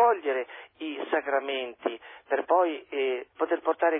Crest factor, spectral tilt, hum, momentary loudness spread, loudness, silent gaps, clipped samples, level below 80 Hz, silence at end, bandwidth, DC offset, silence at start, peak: 16 dB; -6 dB/octave; none; 12 LU; -29 LUFS; none; under 0.1%; -80 dBFS; 0 s; 3.9 kHz; under 0.1%; 0 s; -12 dBFS